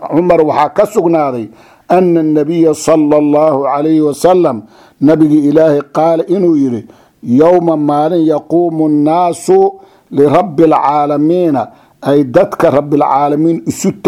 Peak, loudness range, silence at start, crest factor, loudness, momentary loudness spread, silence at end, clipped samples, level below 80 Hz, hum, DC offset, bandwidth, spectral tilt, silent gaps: 0 dBFS; 1 LU; 0 s; 10 dB; -10 LUFS; 6 LU; 0 s; 0.3%; -50 dBFS; none; under 0.1%; 14 kHz; -7 dB/octave; none